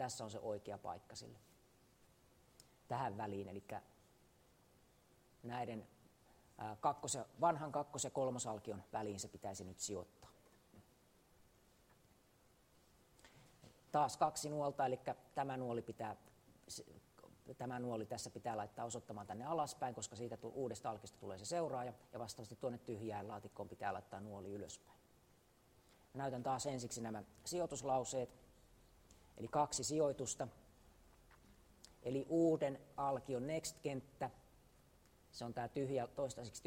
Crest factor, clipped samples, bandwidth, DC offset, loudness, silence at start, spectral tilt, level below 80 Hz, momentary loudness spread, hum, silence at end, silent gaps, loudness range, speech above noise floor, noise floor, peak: 22 dB; under 0.1%; 16 kHz; under 0.1%; -44 LUFS; 0 s; -4.5 dB/octave; -74 dBFS; 14 LU; none; 0 s; none; 8 LU; 29 dB; -72 dBFS; -22 dBFS